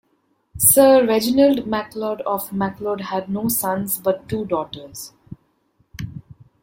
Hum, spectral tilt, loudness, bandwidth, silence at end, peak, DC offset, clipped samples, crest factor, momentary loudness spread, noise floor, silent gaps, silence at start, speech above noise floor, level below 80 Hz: none; -4 dB/octave; -18 LUFS; 16.5 kHz; 0.45 s; 0 dBFS; under 0.1%; under 0.1%; 20 dB; 21 LU; -66 dBFS; none; 0.55 s; 47 dB; -52 dBFS